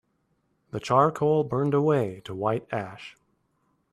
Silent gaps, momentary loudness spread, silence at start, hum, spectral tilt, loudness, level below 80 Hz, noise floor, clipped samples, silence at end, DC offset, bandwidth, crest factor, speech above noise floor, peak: none; 16 LU; 0.75 s; none; -7.5 dB/octave; -25 LUFS; -64 dBFS; -72 dBFS; under 0.1%; 0.8 s; under 0.1%; 12 kHz; 20 dB; 47 dB; -6 dBFS